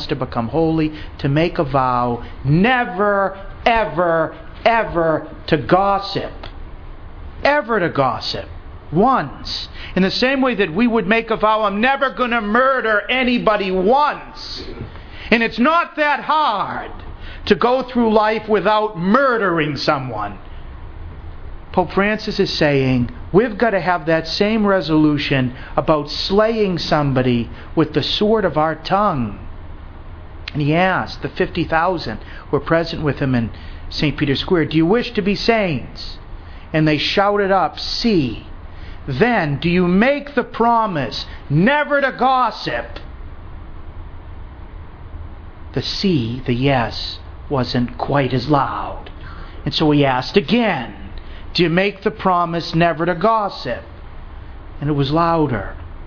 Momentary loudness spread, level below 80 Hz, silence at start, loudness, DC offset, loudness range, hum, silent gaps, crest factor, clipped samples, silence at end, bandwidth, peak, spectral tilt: 20 LU; -36 dBFS; 0 s; -17 LUFS; under 0.1%; 4 LU; none; none; 18 dB; under 0.1%; 0 s; 5.4 kHz; 0 dBFS; -7 dB/octave